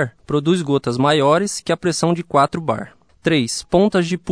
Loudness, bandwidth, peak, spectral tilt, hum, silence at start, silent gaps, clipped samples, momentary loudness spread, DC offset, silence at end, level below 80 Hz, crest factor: -18 LUFS; 11 kHz; -2 dBFS; -5 dB/octave; none; 0 s; none; under 0.1%; 8 LU; 0.1%; 0 s; -50 dBFS; 16 dB